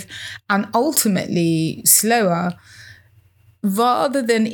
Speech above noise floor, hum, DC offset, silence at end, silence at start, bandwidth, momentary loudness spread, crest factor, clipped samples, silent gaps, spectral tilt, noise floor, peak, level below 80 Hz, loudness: 35 dB; none; under 0.1%; 0 s; 0 s; over 20 kHz; 14 LU; 20 dB; under 0.1%; none; -3.5 dB/octave; -53 dBFS; 0 dBFS; -66 dBFS; -17 LUFS